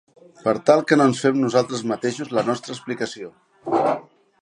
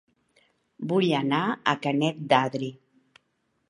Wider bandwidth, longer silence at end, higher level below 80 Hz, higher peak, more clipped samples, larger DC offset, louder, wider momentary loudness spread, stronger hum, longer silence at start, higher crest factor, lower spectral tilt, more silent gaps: about the same, 11.5 kHz vs 11 kHz; second, 0.4 s vs 0.95 s; first, -68 dBFS vs -74 dBFS; about the same, -2 dBFS vs -4 dBFS; neither; neither; first, -21 LUFS vs -25 LUFS; first, 13 LU vs 10 LU; neither; second, 0.45 s vs 0.8 s; about the same, 20 dB vs 24 dB; about the same, -5.5 dB/octave vs -6 dB/octave; neither